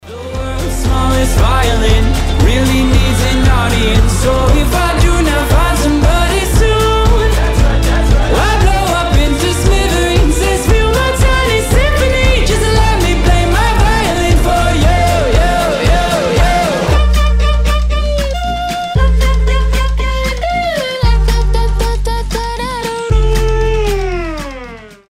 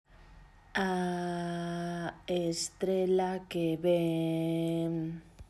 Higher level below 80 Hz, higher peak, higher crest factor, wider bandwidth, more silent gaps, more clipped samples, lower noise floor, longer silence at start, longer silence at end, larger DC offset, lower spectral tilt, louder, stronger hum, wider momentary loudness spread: first, -14 dBFS vs -60 dBFS; first, 0 dBFS vs -16 dBFS; second, 10 dB vs 16 dB; first, 15.5 kHz vs 14 kHz; neither; neither; second, -31 dBFS vs -56 dBFS; about the same, 0.05 s vs 0.15 s; about the same, 0.15 s vs 0.05 s; neither; about the same, -5 dB/octave vs -5.5 dB/octave; first, -12 LUFS vs -32 LUFS; neither; about the same, 6 LU vs 8 LU